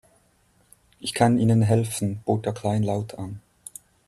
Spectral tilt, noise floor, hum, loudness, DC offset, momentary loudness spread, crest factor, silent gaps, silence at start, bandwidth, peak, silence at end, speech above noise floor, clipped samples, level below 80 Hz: -6.5 dB/octave; -63 dBFS; none; -23 LUFS; under 0.1%; 21 LU; 18 dB; none; 1 s; 13 kHz; -6 dBFS; 0.7 s; 40 dB; under 0.1%; -58 dBFS